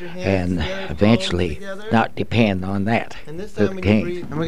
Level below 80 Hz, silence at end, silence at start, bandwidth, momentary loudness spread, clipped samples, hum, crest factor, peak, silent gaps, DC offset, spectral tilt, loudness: -40 dBFS; 0 s; 0 s; 11 kHz; 9 LU; under 0.1%; none; 20 dB; 0 dBFS; none; 3%; -6.5 dB/octave; -20 LUFS